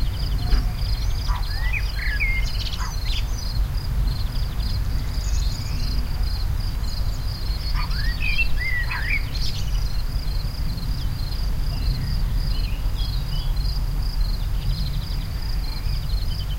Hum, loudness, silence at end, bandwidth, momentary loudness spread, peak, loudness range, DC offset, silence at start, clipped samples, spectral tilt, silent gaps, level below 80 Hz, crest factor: none; -26 LUFS; 0 s; 16 kHz; 5 LU; -6 dBFS; 2 LU; under 0.1%; 0 s; under 0.1%; -4.5 dB/octave; none; -24 dBFS; 16 dB